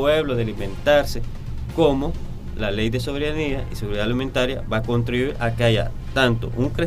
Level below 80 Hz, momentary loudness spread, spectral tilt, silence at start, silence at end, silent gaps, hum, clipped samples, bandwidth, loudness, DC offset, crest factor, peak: -30 dBFS; 10 LU; -6 dB/octave; 0 s; 0 s; none; none; under 0.1%; 15.5 kHz; -22 LUFS; under 0.1%; 16 dB; -4 dBFS